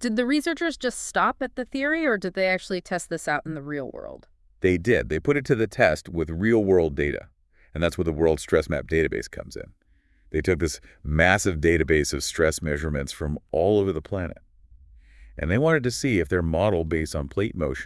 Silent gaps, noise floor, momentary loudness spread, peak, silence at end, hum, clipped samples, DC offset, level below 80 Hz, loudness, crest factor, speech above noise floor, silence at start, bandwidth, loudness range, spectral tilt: none; -58 dBFS; 11 LU; -2 dBFS; 0 s; none; under 0.1%; under 0.1%; -42 dBFS; -24 LUFS; 22 dB; 34 dB; 0 s; 12 kHz; 4 LU; -5.5 dB/octave